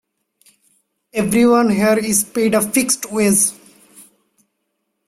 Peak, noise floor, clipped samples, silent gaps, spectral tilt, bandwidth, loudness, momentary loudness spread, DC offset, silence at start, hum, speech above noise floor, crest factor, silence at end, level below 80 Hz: -2 dBFS; -72 dBFS; under 0.1%; none; -4 dB/octave; 16 kHz; -15 LUFS; 5 LU; under 0.1%; 1.15 s; none; 57 dB; 16 dB; 1.05 s; -54 dBFS